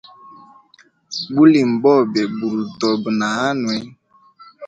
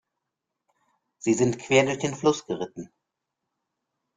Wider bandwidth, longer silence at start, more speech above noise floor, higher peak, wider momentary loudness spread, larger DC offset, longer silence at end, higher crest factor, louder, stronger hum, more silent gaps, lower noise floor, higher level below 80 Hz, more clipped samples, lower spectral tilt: second, 8.6 kHz vs 9.6 kHz; second, 0.3 s vs 1.25 s; second, 37 dB vs 60 dB; first, 0 dBFS vs -6 dBFS; about the same, 11 LU vs 12 LU; neither; second, 0 s vs 1.3 s; about the same, 18 dB vs 22 dB; first, -17 LUFS vs -25 LUFS; neither; neither; second, -53 dBFS vs -84 dBFS; about the same, -62 dBFS vs -64 dBFS; neither; about the same, -5.5 dB/octave vs -4.5 dB/octave